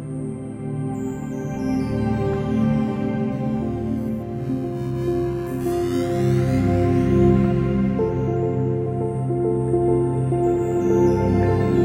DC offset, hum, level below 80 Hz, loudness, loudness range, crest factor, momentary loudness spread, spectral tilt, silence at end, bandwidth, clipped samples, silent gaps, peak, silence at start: under 0.1%; none; -38 dBFS; -22 LUFS; 4 LU; 16 dB; 9 LU; -9 dB/octave; 0 s; 15 kHz; under 0.1%; none; -6 dBFS; 0 s